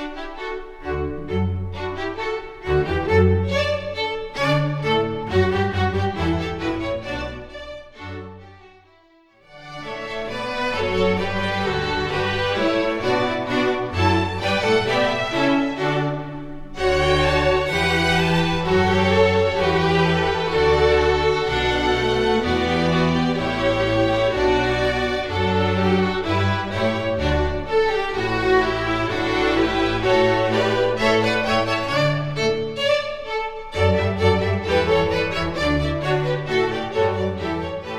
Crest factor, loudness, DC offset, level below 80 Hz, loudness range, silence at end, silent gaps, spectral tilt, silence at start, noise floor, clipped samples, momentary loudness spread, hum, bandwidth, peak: 16 dB; -20 LUFS; under 0.1%; -36 dBFS; 7 LU; 0 s; none; -6 dB/octave; 0 s; -54 dBFS; under 0.1%; 10 LU; none; 13 kHz; -4 dBFS